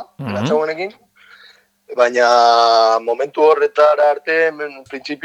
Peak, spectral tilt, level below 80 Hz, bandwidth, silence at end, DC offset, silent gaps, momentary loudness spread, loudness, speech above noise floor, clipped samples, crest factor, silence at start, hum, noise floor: 0 dBFS; -4 dB/octave; -70 dBFS; 11 kHz; 0.1 s; under 0.1%; none; 16 LU; -14 LUFS; 34 dB; under 0.1%; 16 dB; 0 s; none; -49 dBFS